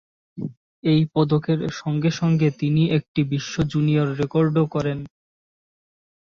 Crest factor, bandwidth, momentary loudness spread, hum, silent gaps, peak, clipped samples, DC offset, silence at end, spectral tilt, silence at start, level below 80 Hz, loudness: 16 dB; 7 kHz; 13 LU; none; 0.57-0.83 s, 3.08-3.15 s; -6 dBFS; under 0.1%; under 0.1%; 1.2 s; -7.5 dB/octave; 0.35 s; -52 dBFS; -21 LUFS